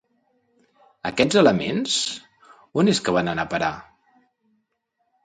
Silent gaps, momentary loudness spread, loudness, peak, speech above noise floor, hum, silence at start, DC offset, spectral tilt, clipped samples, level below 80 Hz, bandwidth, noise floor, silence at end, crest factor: none; 13 LU; -21 LUFS; -2 dBFS; 53 dB; none; 1.05 s; under 0.1%; -4.5 dB/octave; under 0.1%; -56 dBFS; 9.4 kHz; -74 dBFS; 1.45 s; 22 dB